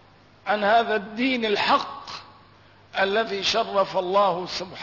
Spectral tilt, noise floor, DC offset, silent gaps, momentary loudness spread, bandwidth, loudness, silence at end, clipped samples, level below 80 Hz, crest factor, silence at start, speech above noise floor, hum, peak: -3.5 dB/octave; -53 dBFS; under 0.1%; none; 14 LU; 6 kHz; -23 LUFS; 0 s; under 0.1%; -64 dBFS; 14 dB; 0.45 s; 30 dB; none; -10 dBFS